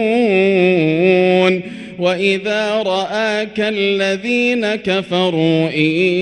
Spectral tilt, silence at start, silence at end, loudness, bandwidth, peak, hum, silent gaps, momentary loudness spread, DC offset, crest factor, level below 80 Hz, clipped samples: -6 dB/octave; 0 s; 0 s; -15 LUFS; 9.6 kHz; 0 dBFS; none; none; 6 LU; under 0.1%; 14 dB; -58 dBFS; under 0.1%